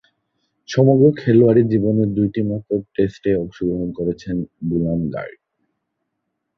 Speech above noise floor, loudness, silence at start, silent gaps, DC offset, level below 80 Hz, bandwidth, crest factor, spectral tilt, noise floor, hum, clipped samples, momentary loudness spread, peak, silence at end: 58 dB; -18 LUFS; 0.7 s; none; under 0.1%; -46 dBFS; 6.8 kHz; 16 dB; -9 dB/octave; -76 dBFS; none; under 0.1%; 12 LU; -2 dBFS; 1.25 s